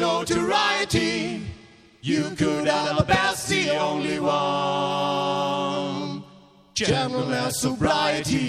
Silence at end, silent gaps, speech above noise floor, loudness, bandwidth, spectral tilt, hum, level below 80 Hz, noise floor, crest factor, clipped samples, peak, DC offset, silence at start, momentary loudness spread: 0 s; none; 28 dB; -23 LUFS; 15.5 kHz; -4 dB/octave; none; -48 dBFS; -51 dBFS; 20 dB; under 0.1%; -4 dBFS; under 0.1%; 0 s; 9 LU